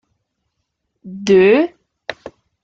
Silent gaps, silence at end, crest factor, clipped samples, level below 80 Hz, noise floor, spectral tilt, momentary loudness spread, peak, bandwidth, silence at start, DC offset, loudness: none; 0.5 s; 16 dB; under 0.1%; -60 dBFS; -73 dBFS; -6 dB/octave; 21 LU; -2 dBFS; 7.6 kHz; 1.05 s; under 0.1%; -14 LUFS